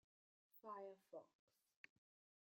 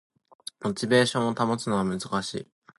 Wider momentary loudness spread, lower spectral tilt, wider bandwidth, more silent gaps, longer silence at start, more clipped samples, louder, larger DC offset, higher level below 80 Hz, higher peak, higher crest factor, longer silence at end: second, 13 LU vs 16 LU; about the same, -5.5 dB/octave vs -5 dB/octave; first, 15.5 kHz vs 11.5 kHz; neither; about the same, 0.55 s vs 0.6 s; neither; second, -60 LUFS vs -26 LUFS; neither; second, under -90 dBFS vs -62 dBFS; second, -42 dBFS vs -8 dBFS; about the same, 22 dB vs 20 dB; first, 1.15 s vs 0.35 s